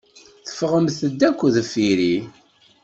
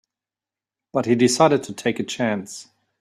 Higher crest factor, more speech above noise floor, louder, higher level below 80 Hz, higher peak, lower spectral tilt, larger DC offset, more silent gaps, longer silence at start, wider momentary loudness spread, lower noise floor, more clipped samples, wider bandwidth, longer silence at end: about the same, 16 dB vs 20 dB; second, 21 dB vs over 70 dB; about the same, -20 LUFS vs -21 LUFS; about the same, -60 dBFS vs -62 dBFS; about the same, -4 dBFS vs -2 dBFS; about the same, -5.5 dB/octave vs -4.5 dB/octave; neither; neither; second, 0.45 s vs 0.95 s; about the same, 15 LU vs 14 LU; second, -40 dBFS vs under -90 dBFS; neither; second, 8.2 kHz vs 14 kHz; first, 0.55 s vs 0.4 s